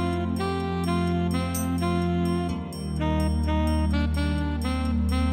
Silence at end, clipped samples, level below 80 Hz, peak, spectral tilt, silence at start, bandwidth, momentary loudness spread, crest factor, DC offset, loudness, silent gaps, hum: 0 s; under 0.1%; -30 dBFS; -12 dBFS; -6.5 dB/octave; 0 s; 15.5 kHz; 3 LU; 12 dB; under 0.1%; -26 LUFS; none; none